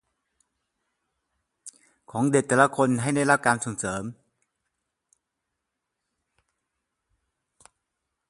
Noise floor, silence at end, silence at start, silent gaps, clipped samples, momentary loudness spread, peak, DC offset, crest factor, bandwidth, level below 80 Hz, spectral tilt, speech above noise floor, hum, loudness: -83 dBFS; 4.15 s; 1.65 s; none; under 0.1%; 13 LU; -2 dBFS; under 0.1%; 26 dB; 11.5 kHz; -64 dBFS; -5 dB/octave; 60 dB; none; -23 LUFS